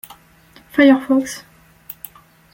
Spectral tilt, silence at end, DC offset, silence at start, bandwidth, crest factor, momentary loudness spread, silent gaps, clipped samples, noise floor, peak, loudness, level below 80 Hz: -4 dB/octave; 0.6 s; under 0.1%; 0.75 s; 17 kHz; 18 dB; 23 LU; none; under 0.1%; -49 dBFS; 0 dBFS; -15 LUFS; -58 dBFS